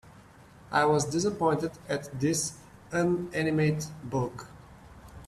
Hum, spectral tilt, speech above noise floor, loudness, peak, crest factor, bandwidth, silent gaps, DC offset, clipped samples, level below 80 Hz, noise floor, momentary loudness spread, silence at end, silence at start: none; -5 dB/octave; 25 dB; -29 LUFS; -10 dBFS; 20 dB; 13.5 kHz; none; under 0.1%; under 0.1%; -58 dBFS; -53 dBFS; 11 LU; 0 s; 0.05 s